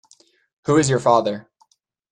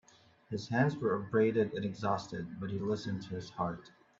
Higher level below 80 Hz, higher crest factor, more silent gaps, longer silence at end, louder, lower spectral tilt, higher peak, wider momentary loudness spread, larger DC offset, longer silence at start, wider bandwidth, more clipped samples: first, -58 dBFS vs -68 dBFS; about the same, 18 dB vs 18 dB; neither; first, 0.7 s vs 0.3 s; first, -19 LUFS vs -35 LUFS; second, -5.5 dB/octave vs -7 dB/octave; first, -2 dBFS vs -16 dBFS; first, 15 LU vs 12 LU; neither; first, 0.7 s vs 0.5 s; first, 11 kHz vs 7.6 kHz; neither